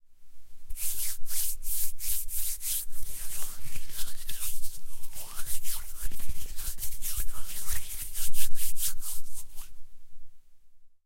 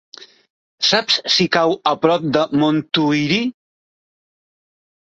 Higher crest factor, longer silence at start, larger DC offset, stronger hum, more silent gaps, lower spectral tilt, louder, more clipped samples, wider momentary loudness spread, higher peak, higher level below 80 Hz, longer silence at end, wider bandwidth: about the same, 14 dB vs 18 dB; about the same, 0.1 s vs 0.2 s; neither; neither; second, none vs 0.50-0.78 s; second, -0.5 dB/octave vs -4.5 dB/octave; second, -34 LUFS vs -17 LUFS; neither; first, 11 LU vs 4 LU; second, -8 dBFS vs 0 dBFS; first, -38 dBFS vs -60 dBFS; second, 0.2 s vs 1.5 s; first, 16.5 kHz vs 8 kHz